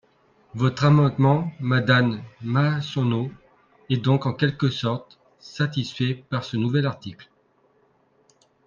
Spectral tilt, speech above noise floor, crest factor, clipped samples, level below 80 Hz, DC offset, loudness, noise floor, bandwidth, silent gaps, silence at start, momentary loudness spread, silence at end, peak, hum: -7.5 dB/octave; 41 dB; 20 dB; under 0.1%; -60 dBFS; under 0.1%; -23 LUFS; -63 dBFS; 7.2 kHz; none; 0.55 s; 13 LU; 1.45 s; -4 dBFS; none